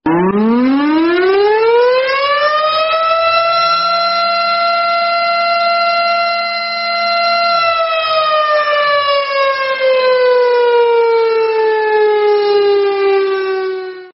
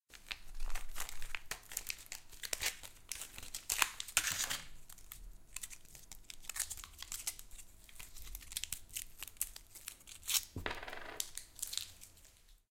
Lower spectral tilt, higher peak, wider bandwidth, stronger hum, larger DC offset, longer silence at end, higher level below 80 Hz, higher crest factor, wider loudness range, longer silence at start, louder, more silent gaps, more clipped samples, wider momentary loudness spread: first, -1.5 dB/octave vs 0.5 dB/octave; first, 0 dBFS vs -10 dBFS; second, 6 kHz vs 17 kHz; neither; neither; about the same, 0.05 s vs 0.15 s; about the same, -56 dBFS vs -52 dBFS; second, 12 dB vs 32 dB; second, 1 LU vs 7 LU; about the same, 0.05 s vs 0.1 s; first, -12 LUFS vs -41 LUFS; neither; neither; second, 3 LU vs 19 LU